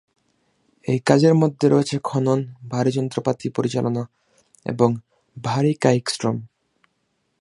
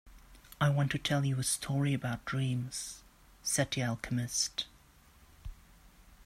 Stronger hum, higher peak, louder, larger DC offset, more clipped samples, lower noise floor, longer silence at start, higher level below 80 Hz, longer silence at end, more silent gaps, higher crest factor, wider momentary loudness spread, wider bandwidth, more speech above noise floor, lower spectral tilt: neither; first, 0 dBFS vs -14 dBFS; first, -21 LUFS vs -33 LUFS; neither; neither; first, -71 dBFS vs -61 dBFS; first, 0.85 s vs 0.05 s; second, -62 dBFS vs -56 dBFS; first, 0.95 s vs 0 s; neither; about the same, 20 dB vs 20 dB; about the same, 14 LU vs 16 LU; second, 11.5 kHz vs 15 kHz; first, 51 dB vs 28 dB; first, -6.5 dB/octave vs -4 dB/octave